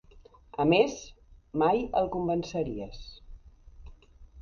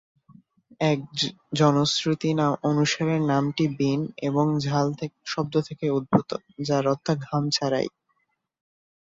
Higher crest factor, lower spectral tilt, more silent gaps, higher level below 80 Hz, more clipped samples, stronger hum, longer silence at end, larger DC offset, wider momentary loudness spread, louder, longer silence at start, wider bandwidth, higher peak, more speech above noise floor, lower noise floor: about the same, 20 dB vs 20 dB; about the same, -6 dB/octave vs -5.5 dB/octave; neither; first, -50 dBFS vs -62 dBFS; neither; neither; second, 0 s vs 1.2 s; neither; first, 21 LU vs 5 LU; second, -28 LUFS vs -25 LUFS; second, 0.15 s vs 0.8 s; about the same, 7.2 kHz vs 7.8 kHz; second, -10 dBFS vs -4 dBFS; second, 27 dB vs 49 dB; second, -55 dBFS vs -74 dBFS